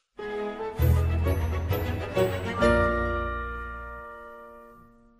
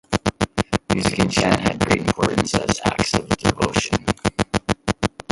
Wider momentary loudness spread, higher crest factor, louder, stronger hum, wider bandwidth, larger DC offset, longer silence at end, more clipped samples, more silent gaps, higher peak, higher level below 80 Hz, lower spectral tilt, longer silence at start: first, 18 LU vs 5 LU; about the same, 18 dB vs 20 dB; second, -27 LUFS vs -21 LUFS; neither; first, 15.5 kHz vs 11.5 kHz; neither; first, 0.45 s vs 0.25 s; neither; neither; second, -10 dBFS vs -2 dBFS; about the same, -34 dBFS vs -38 dBFS; first, -7 dB/octave vs -4.5 dB/octave; about the same, 0.2 s vs 0.1 s